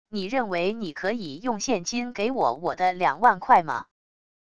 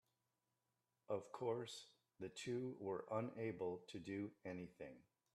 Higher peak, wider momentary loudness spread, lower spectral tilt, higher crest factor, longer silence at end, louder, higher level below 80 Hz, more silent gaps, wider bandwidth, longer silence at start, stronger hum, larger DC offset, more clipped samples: first, -4 dBFS vs -30 dBFS; about the same, 9 LU vs 11 LU; second, -4 dB/octave vs -6 dB/octave; about the same, 20 dB vs 20 dB; first, 0.7 s vs 0.35 s; first, -25 LUFS vs -49 LUFS; first, -62 dBFS vs -86 dBFS; neither; second, 11 kHz vs 13 kHz; second, 0.05 s vs 1.1 s; neither; first, 0.5% vs under 0.1%; neither